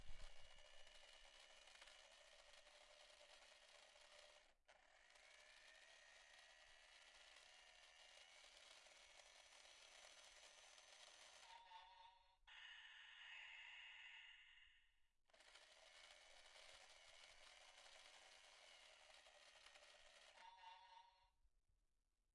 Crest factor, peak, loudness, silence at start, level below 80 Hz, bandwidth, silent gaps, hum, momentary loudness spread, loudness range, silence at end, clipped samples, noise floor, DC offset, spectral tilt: 22 dB; -44 dBFS; -65 LUFS; 0 s; -78 dBFS; 11 kHz; none; none; 7 LU; 6 LU; 0.05 s; under 0.1%; -88 dBFS; under 0.1%; 0.5 dB/octave